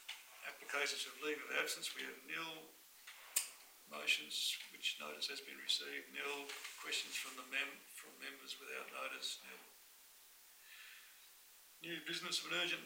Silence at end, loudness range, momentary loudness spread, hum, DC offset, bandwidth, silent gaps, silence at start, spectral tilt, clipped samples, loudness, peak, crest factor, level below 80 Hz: 0 s; 9 LU; 20 LU; none; under 0.1%; 16 kHz; none; 0 s; 0 dB/octave; under 0.1%; -42 LUFS; -22 dBFS; 24 dB; under -90 dBFS